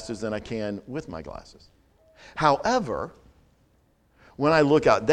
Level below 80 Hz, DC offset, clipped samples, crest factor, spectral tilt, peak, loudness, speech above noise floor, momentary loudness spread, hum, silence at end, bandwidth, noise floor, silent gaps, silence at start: -52 dBFS; under 0.1%; under 0.1%; 22 dB; -5.5 dB/octave; -4 dBFS; -24 LUFS; 39 dB; 19 LU; none; 0 s; 10 kHz; -64 dBFS; none; 0 s